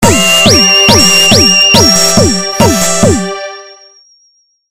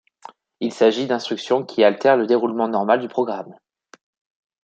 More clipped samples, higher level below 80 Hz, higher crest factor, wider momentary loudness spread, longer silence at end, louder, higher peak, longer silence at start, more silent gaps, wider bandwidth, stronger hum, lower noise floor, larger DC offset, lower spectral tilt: first, 3% vs under 0.1%; first, -28 dBFS vs -74 dBFS; second, 8 dB vs 18 dB; second, 9 LU vs 12 LU; second, 0 s vs 1.1 s; first, -5 LUFS vs -19 LUFS; about the same, 0 dBFS vs -2 dBFS; second, 0 s vs 0.6 s; neither; first, over 20 kHz vs 8.8 kHz; neither; first, -52 dBFS vs -45 dBFS; neither; second, -2.5 dB/octave vs -5.5 dB/octave